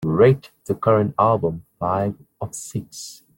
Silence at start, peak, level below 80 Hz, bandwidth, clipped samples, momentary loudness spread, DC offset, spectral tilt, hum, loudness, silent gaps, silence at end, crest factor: 0 s; -4 dBFS; -54 dBFS; 17 kHz; under 0.1%; 16 LU; under 0.1%; -7 dB/octave; none; -21 LUFS; none; 0.25 s; 18 dB